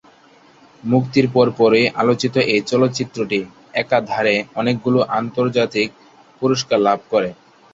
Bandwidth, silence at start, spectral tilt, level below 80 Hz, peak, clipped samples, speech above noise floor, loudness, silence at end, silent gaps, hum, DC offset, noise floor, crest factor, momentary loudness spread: 7.8 kHz; 0.85 s; -5.5 dB/octave; -58 dBFS; -2 dBFS; under 0.1%; 32 dB; -18 LUFS; 0.4 s; none; none; under 0.1%; -49 dBFS; 16 dB; 8 LU